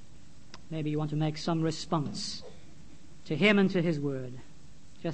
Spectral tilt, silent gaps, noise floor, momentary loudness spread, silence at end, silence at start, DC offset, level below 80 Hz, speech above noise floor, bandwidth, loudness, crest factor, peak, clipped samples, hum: -6 dB/octave; none; -55 dBFS; 17 LU; 0 s; 0.15 s; 0.8%; -60 dBFS; 26 dB; 8.8 kHz; -30 LUFS; 20 dB; -10 dBFS; under 0.1%; none